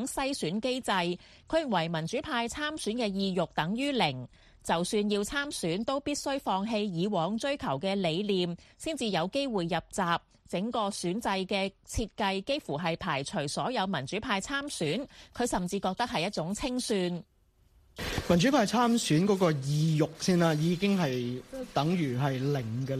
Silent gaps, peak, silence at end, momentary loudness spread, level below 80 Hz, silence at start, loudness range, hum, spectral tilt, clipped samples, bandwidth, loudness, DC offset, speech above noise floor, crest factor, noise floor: none; -12 dBFS; 0 s; 8 LU; -54 dBFS; 0 s; 5 LU; none; -5 dB/octave; under 0.1%; 15 kHz; -30 LUFS; under 0.1%; 34 dB; 20 dB; -64 dBFS